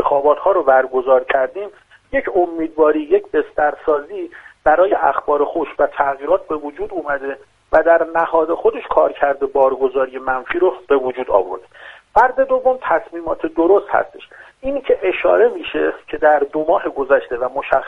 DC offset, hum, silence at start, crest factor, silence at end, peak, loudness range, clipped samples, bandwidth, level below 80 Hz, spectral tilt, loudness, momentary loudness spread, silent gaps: under 0.1%; none; 0 s; 16 dB; 0 s; 0 dBFS; 2 LU; under 0.1%; 4.1 kHz; -46 dBFS; -6.5 dB/octave; -17 LUFS; 10 LU; none